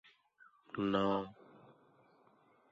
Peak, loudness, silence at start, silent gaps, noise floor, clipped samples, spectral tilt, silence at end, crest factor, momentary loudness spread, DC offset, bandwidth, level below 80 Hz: -20 dBFS; -37 LUFS; 0.75 s; none; -69 dBFS; under 0.1%; -5 dB/octave; 1.4 s; 22 dB; 18 LU; under 0.1%; 7.4 kHz; -72 dBFS